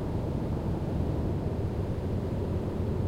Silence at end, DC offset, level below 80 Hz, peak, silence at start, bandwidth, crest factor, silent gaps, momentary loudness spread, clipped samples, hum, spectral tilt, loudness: 0 s; under 0.1%; -38 dBFS; -18 dBFS; 0 s; 14 kHz; 12 dB; none; 1 LU; under 0.1%; none; -9 dB/octave; -32 LUFS